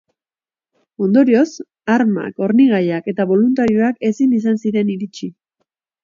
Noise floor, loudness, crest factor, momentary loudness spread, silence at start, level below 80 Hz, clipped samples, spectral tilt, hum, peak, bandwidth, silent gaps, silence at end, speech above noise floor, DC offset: under -90 dBFS; -16 LUFS; 14 dB; 11 LU; 1 s; -60 dBFS; under 0.1%; -7.5 dB/octave; none; -2 dBFS; 7.4 kHz; none; 0.75 s; over 75 dB; under 0.1%